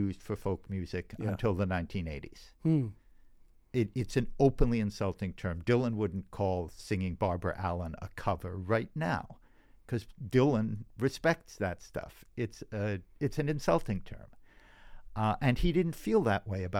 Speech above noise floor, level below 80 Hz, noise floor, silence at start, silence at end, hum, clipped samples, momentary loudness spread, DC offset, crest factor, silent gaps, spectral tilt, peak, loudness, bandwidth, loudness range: 27 dB; -46 dBFS; -59 dBFS; 0 s; 0 s; none; under 0.1%; 10 LU; under 0.1%; 20 dB; none; -7.5 dB/octave; -12 dBFS; -33 LUFS; 16 kHz; 3 LU